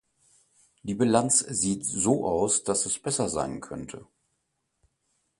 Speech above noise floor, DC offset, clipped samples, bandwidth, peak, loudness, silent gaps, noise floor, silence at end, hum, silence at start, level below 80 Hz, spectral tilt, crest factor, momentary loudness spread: 51 dB; under 0.1%; under 0.1%; 11.5 kHz; -6 dBFS; -25 LUFS; none; -78 dBFS; 1.35 s; none; 0.85 s; -58 dBFS; -4 dB/octave; 22 dB; 16 LU